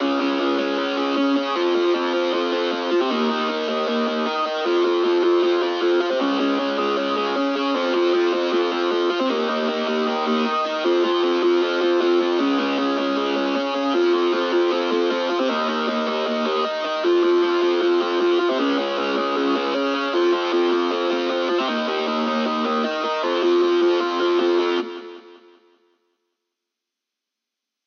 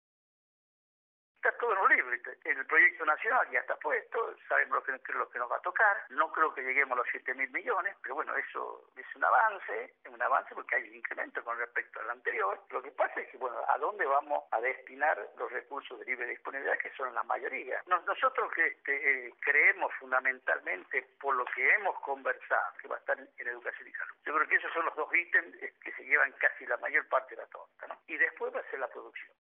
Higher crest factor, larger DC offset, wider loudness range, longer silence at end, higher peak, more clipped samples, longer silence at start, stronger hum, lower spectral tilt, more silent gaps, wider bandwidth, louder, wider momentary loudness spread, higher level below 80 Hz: second, 12 dB vs 22 dB; neither; second, 1 LU vs 5 LU; first, 2.5 s vs 0.25 s; first, -8 dBFS vs -12 dBFS; neither; second, 0 s vs 1.45 s; neither; first, -1 dB/octave vs 9.5 dB/octave; neither; first, 6.8 kHz vs 3.9 kHz; first, -21 LUFS vs -31 LUFS; second, 4 LU vs 14 LU; about the same, under -90 dBFS vs under -90 dBFS